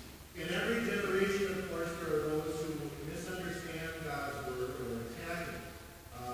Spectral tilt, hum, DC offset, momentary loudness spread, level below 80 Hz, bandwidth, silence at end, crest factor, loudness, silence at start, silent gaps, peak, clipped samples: -5 dB/octave; none; under 0.1%; 11 LU; -56 dBFS; 16 kHz; 0 s; 20 dB; -37 LUFS; 0 s; none; -18 dBFS; under 0.1%